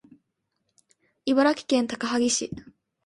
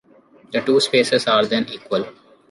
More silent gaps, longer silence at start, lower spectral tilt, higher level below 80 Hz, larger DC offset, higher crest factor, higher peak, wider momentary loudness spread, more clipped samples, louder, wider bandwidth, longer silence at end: neither; first, 1.25 s vs 0.5 s; about the same, -3 dB/octave vs -4 dB/octave; about the same, -64 dBFS vs -64 dBFS; neither; about the same, 18 dB vs 16 dB; second, -8 dBFS vs -4 dBFS; first, 13 LU vs 9 LU; neither; second, -24 LUFS vs -19 LUFS; about the same, 11.5 kHz vs 11.5 kHz; about the same, 0.45 s vs 0.4 s